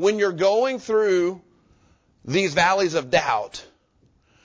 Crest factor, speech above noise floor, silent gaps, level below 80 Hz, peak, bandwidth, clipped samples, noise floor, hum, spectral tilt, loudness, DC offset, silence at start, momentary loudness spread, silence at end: 16 dB; 41 dB; none; -58 dBFS; -6 dBFS; 8 kHz; under 0.1%; -62 dBFS; none; -4.5 dB/octave; -21 LUFS; under 0.1%; 0 s; 16 LU; 0.8 s